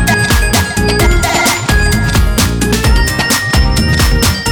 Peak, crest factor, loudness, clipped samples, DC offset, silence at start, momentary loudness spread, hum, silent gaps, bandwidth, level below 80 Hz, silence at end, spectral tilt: 0 dBFS; 10 dB; -11 LUFS; under 0.1%; under 0.1%; 0 s; 2 LU; none; none; over 20 kHz; -14 dBFS; 0 s; -4 dB/octave